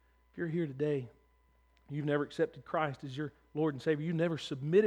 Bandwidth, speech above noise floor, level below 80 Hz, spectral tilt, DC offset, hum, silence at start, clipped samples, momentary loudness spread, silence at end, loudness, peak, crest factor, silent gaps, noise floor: 10.5 kHz; 35 dB; -70 dBFS; -7.5 dB/octave; under 0.1%; none; 0.35 s; under 0.1%; 9 LU; 0 s; -35 LUFS; -16 dBFS; 18 dB; none; -68 dBFS